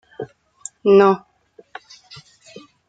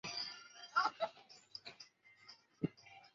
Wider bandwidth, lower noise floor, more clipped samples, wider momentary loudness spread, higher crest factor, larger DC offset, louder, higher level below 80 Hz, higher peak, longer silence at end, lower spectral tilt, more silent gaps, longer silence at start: first, 9.2 kHz vs 7.6 kHz; second, -46 dBFS vs -64 dBFS; neither; first, 27 LU vs 23 LU; about the same, 20 dB vs 24 dB; neither; first, -16 LUFS vs -42 LUFS; first, -66 dBFS vs -84 dBFS; first, -2 dBFS vs -22 dBFS; first, 1.7 s vs 0.1 s; first, -6 dB/octave vs -2.5 dB/octave; neither; first, 0.2 s vs 0.05 s